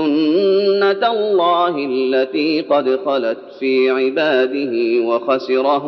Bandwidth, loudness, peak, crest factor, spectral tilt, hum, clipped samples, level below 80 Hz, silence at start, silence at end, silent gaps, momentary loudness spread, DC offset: 6 kHz; -16 LUFS; -2 dBFS; 14 dB; -2.5 dB/octave; none; under 0.1%; -72 dBFS; 0 s; 0 s; none; 4 LU; under 0.1%